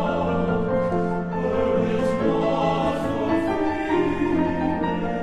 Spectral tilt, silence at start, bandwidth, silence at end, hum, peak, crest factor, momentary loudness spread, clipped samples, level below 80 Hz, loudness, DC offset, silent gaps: -7.5 dB/octave; 0 s; 10.5 kHz; 0 s; none; -10 dBFS; 12 dB; 3 LU; under 0.1%; -42 dBFS; -23 LUFS; under 0.1%; none